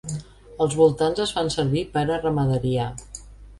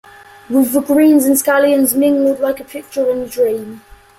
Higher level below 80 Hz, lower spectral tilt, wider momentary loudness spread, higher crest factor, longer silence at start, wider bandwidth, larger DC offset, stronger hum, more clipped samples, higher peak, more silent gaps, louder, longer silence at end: first, -44 dBFS vs -52 dBFS; first, -6 dB/octave vs -3.5 dB/octave; first, 16 LU vs 12 LU; first, 18 dB vs 12 dB; second, 0.05 s vs 0.5 s; second, 11.5 kHz vs 16.5 kHz; neither; neither; neither; second, -6 dBFS vs -2 dBFS; neither; second, -23 LUFS vs -14 LUFS; second, 0.05 s vs 0.4 s